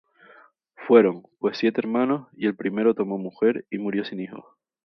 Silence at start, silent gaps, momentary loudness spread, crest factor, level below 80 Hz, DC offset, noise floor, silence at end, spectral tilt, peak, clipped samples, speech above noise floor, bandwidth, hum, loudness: 0.8 s; none; 16 LU; 22 dB; -74 dBFS; under 0.1%; -54 dBFS; 0.45 s; -8 dB/octave; -2 dBFS; under 0.1%; 31 dB; 6 kHz; none; -23 LUFS